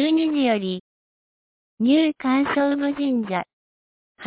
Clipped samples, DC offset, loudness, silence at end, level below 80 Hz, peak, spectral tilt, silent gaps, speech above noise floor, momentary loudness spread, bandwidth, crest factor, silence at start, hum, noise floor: under 0.1%; under 0.1%; -22 LUFS; 0 s; -66 dBFS; -8 dBFS; -9.5 dB/octave; 0.80-1.78 s, 3.53-4.15 s; over 69 dB; 10 LU; 4 kHz; 14 dB; 0 s; none; under -90 dBFS